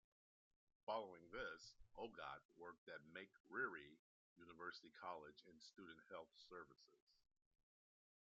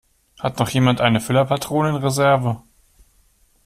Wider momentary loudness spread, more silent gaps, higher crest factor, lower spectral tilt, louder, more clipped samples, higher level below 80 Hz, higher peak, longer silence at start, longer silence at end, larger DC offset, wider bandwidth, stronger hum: first, 14 LU vs 10 LU; first, 2.45-2.49 s, 2.78-2.87 s, 3.40-3.44 s, 3.99-4.36 s, 7.02-7.07 s vs none; about the same, 22 dB vs 18 dB; second, -1.5 dB/octave vs -5.5 dB/octave; second, -55 LUFS vs -19 LUFS; neither; second, -84 dBFS vs -50 dBFS; second, -34 dBFS vs -2 dBFS; first, 0.85 s vs 0.4 s; first, 1.2 s vs 1.05 s; neither; second, 7.4 kHz vs 15 kHz; neither